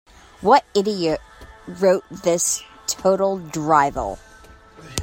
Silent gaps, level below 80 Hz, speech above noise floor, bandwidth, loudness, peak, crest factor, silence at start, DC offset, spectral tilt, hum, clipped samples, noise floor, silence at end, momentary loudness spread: none; -48 dBFS; 27 dB; 16.5 kHz; -20 LUFS; -2 dBFS; 20 dB; 0.4 s; under 0.1%; -3.5 dB/octave; none; under 0.1%; -46 dBFS; 0 s; 12 LU